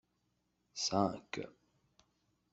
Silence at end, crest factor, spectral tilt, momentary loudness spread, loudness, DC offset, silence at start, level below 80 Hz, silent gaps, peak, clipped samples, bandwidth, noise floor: 1 s; 26 dB; -4 dB/octave; 16 LU; -37 LUFS; under 0.1%; 0.75 s; -76 dBFS; none; -16 dBFS; under 0.1%; 8.2 kHz; -81 dBFS